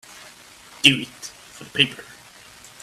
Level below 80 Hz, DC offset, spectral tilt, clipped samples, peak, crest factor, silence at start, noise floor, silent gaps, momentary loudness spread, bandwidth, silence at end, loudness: -62 dBFS; under 0.1%; -2.5 dB/octave; under 0.1%; 0 dBFS; 26 dB; 0.85 s; -47 dBFS; none; 25 LU; 16 kHz; 0.8 s; -19 LUFS